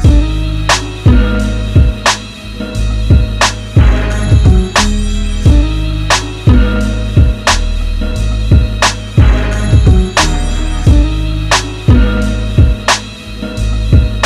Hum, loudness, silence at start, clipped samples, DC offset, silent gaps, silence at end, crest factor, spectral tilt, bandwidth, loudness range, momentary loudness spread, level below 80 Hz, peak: none; -12 LUFS; 0 s; under 0.1%; under 0.1%; none; 0 s; 10 dB; -5 dB/octave; 12.5 kHz; 1 LU; 8 LU; -12 dBFS; 0 dBFS